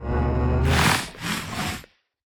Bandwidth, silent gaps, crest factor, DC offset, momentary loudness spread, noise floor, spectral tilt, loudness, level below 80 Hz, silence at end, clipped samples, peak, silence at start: 19.5 kHz; none; 18 dB; under 0.1%; 10 LU; -43 dBFS; -4.5 dB/octave; -23 LUFS; -32 dBFS; 0.55 s; under 0.1%; -6 dBFS; 0 s